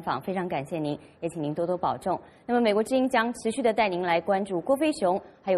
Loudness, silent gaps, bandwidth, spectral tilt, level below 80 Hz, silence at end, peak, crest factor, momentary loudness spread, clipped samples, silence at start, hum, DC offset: -27 LUFS; none; 13.5 kHz; -5.5 dB/octave; -62 dBFS; 0 s; -10 dBFS; 18 dB; 8 LU; under 0.1%; 0 s; none; under 0.1%